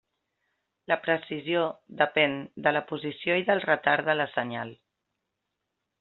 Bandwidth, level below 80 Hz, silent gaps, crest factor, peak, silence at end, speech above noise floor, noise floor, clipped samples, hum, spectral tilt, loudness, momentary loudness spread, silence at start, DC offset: 4.3 kHz; -74 dBFS; none; 22 dB; -6 dBFS; 1.25 s; 56 dB; -83 dBFS; under 0.1%; none; -2 dB/octave; -27 LUFS; 9 LU; 0.9 s; under 0.1%